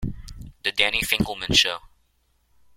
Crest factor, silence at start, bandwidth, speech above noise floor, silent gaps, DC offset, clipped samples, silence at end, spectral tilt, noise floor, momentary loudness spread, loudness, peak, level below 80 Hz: 24 dB; 0 s; 16.5 kHz; 44 dB; none; under 0.1%; under 0.1%; 1 s; -2.5 dB/octave; -66 dBFS; 19 LU; -21 LUFS; -2 dBFS; -42 dBFS